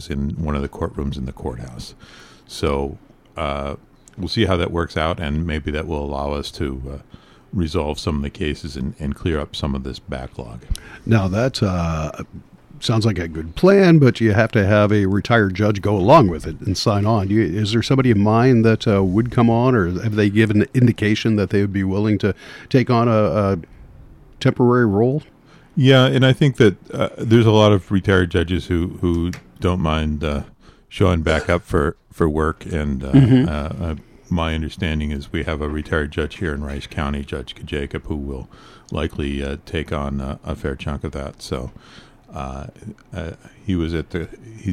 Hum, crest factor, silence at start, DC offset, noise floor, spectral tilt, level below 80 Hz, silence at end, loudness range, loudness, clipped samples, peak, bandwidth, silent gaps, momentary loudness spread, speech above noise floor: none; 18 dB; 0 s; under 0.1%; -43 dBFS; -7 dB/octave; -34 dBFS; 0 s; 11 LU; -19 LUFS; under 0.1%; -2 dBFS; 13 kHz; none; 16 LU; 25 dB